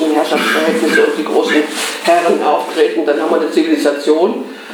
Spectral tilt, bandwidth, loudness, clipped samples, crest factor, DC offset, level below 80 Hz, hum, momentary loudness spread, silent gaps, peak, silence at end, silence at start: -3.5 dB/octave; over 20 kHz; -13 LUFS; under 0.1%; 12 dB; under 0.1%; -76 dBFS; none; 3 LU; none; 0 dBFS; 0 s; 0 s